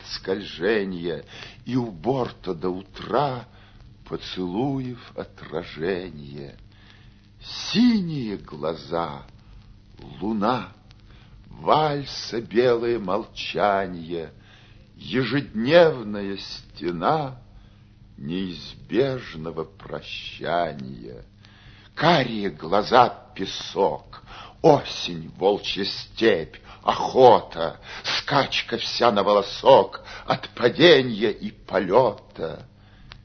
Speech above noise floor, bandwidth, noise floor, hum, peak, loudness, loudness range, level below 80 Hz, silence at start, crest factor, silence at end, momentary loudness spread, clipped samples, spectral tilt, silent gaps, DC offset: 27 dB; 6.6 kHz; -50 dBFS; none; 0 dBFS; -23 LUFS; 10 LU; -52 dBFS; 0 s; 24 dB; 0.15 s; 19 LU; under 0.1%; -5.5 dB/octave; none; under 0.1%